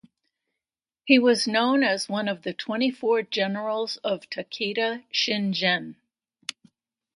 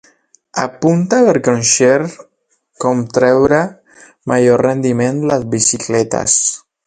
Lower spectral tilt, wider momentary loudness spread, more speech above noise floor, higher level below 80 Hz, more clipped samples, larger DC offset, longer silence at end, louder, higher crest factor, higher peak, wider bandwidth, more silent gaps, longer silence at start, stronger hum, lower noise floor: about the same, -4 dB/octave vs -4 dB/octave; first, 15 LU vs 10 LU; first, over 66 dB vs 39 dB; second, -76 dBFS vs -50 dBFS; neither; neither; first, 0.65 s vs 0.3 s; second, -24 LUFS vs -13 LUFS; first, 22 dB vs 14 dB; second, -4 dBFS vs 0 dBFS; first, 11.5 kHz vs 9.6 kHz; neither; first, 1.05 s vs 0.55 s; neither; first, under -90 dBFS vs -52 dBFS